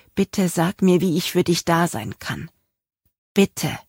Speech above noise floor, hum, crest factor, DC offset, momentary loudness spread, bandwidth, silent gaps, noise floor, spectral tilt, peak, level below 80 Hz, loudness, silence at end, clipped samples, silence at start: 52 dB; none; 18 dB; under 0.1%; 12 LU; 16.5 kHz; 3.18-3.35 s; -73 dBFS; -5.5 dB/octave; -4 dBFS; -54 dBFS; -21 LUFS; 0.1 s; under 0.1%; 0.15 s